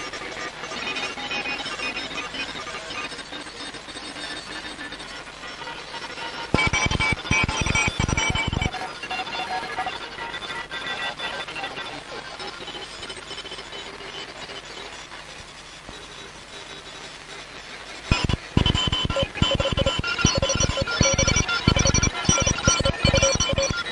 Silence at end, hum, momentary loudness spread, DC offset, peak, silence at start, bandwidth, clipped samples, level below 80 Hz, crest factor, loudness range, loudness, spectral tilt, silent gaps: 0 s; none; 17 LU; under 0.1%; -2 dBFS; 0 s; 11.5 kHz; under 0.1%; -36 dBFS; 24 dB; 15 LU; -24 LUFS; -3 dB/octave; none